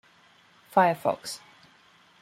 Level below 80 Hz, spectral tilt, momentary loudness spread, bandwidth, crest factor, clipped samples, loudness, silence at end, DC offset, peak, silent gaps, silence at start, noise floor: -76 dBFS; -4.5 dB/octave; 16 LU; 16 kHz; 24 dB; under 0.1%; -26 LUFS; 0.85 s; under 0.1%; -6 dBFS; none; 0.75 s; -59 dBFS